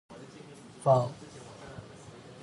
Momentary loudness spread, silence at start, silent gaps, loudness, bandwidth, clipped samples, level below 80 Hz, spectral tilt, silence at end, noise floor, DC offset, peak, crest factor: 23 LU; 0.1 s; none; -28 LUFS; 11.5 kHz; under 0.1%; -66 dBFS; -7 dB/octave; 0.1 s; -50 dBFS; under 0.1%; -12 dBFS; 22 dB